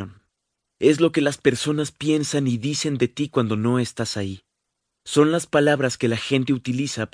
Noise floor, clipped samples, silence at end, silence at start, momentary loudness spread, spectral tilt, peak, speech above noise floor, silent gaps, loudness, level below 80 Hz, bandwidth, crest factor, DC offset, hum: -79 dBFS; under 0.1%; 0.05 s; 0 s; 8 LU; -5 dB/octave; -2 dBFS; 58 dB; none; -22 LUFS; -60 dBFS; 10.5 kHz; 20 dB; under 0.1%; none